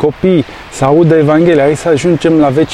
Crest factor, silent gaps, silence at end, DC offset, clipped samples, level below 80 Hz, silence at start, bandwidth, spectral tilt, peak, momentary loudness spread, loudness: 10 dB; none; 0 s; under 0.1%; under 0.1%; -38 dBFS; 0 s; 12 kHz; -7 dB/octave; 0 dBFS; 5 LU; -9 LUFS